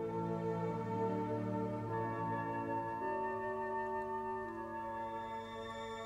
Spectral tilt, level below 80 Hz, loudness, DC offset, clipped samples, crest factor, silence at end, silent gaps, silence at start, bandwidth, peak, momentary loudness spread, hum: -7.5 dB/octave; -66 dBFS; -40 LUFS; under 0.1%; under 0.1%; 14 dB; 0 s; none; 0 s; 14.5 kHz; -26 dBFS; 5 LU; none